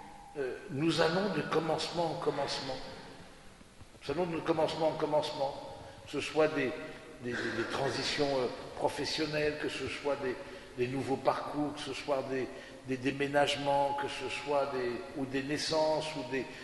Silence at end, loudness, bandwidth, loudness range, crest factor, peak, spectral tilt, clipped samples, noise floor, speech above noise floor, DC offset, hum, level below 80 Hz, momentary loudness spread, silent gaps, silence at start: 0 s; -34 LUFS; 11.5 kHz; 3 LU; 20 dB; -14 dBFS; -4.5 dB/octave; under 0.1%; -54 dBFS; 21 dB; under 0.1%; none; -60 dBFS; 13 LU; none; 0 s